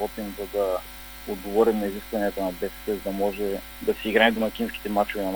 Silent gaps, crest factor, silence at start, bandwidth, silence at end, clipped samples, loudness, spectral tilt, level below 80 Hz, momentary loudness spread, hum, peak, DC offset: none; 22 dB; 0 s; over 20 kHz; 0 s; under 0.1%; -26 LUFS; -4.5 dB/octave; -46 dBFS; 11 LU; none; -4 dBFS; under 0.1%